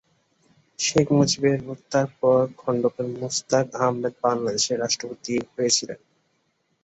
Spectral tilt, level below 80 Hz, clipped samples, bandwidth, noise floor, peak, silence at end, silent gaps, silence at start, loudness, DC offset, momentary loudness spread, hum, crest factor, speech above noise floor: -4 dB/octave; -60 dBFS; under 0.1%; 8.2 kHz; -70 dBFS; -6 dBFS; 0.9 s; none; 0.8 s; -23 LUFS; under 0.1%; 8 LU; none; 18 dB; 47 dB